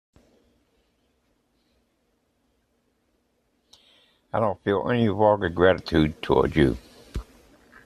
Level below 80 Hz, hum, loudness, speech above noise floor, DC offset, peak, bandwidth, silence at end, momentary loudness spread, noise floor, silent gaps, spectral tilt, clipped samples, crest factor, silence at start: -44 dBFS; none; -23 LUFS; 49 dB; under 0.1%; -4 dBFS; 13 kHz; 0.65 s; 19 LU; -70 dBFS; none; -7.5 dB/octave; under 0.1%; 22 dB; 4.35 s